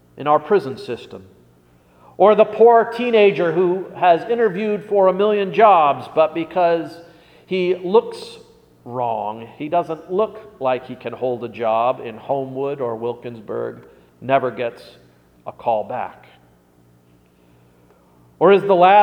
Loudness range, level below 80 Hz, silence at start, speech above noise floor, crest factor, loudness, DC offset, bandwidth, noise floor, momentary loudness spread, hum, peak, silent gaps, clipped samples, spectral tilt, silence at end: 10 LU; -64 dBFS; 0.15 s; 36 dB; 18 dB; -18 LUFS; under 0.1%; 9.6 kHz; -54 dBFS; 18 LU; 60 Hz at -55 dBFS; 0 dBFS; none; under 0.1%; -7 dB/octave; 0 s